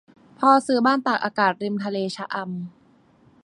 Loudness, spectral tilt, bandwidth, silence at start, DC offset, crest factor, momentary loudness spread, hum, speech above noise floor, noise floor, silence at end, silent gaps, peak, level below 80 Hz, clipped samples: -22 LUFS; -5.5 dB/octave; 11 kHz; 0.4 s; under 0.1%; 20 dB; 13 LU; none; 35 dB; -56 dBFS; 0.75 s; none; -4 dBFS; -72 dBFS; under 0.1%